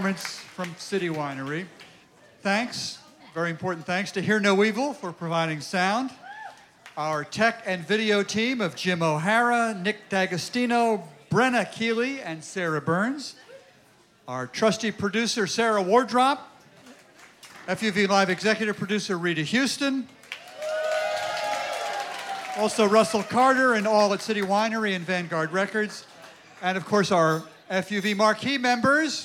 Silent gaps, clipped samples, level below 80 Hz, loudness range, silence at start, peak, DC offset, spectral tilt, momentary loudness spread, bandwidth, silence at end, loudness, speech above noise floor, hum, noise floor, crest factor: none; under 0.1%; -70 dBFS; 5 LU; 0 s; -6 dBFS; under 0.1%; -4.5 dB/octave; 13 LU; 16 kHz; 0 s; -25 LUFS; 33 dB; none; -58 dBFS; 20 dB